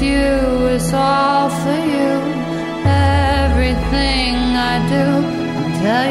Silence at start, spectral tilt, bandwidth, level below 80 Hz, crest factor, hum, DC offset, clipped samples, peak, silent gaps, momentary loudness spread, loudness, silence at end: 0 s; -6 dB/octave; 14 kHz; -24 dBFS; 12 dB; none; under 0.1%; under 0.1%; -2 dBFS; none; 5 LU; -16 LUFS; 0 s